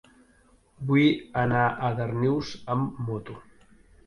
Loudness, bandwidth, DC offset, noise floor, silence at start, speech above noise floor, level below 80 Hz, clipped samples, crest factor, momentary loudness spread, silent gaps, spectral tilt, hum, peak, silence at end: -26 LUFS; 10.5 kHz; under 0.1%; -60 dBFS; 0.8 s; 35 dB; -56 dBFS; under 0.1%; 18 dB; 15 LU; none; -7.5 dB/octave; none; -10 dBFS; 0.65 s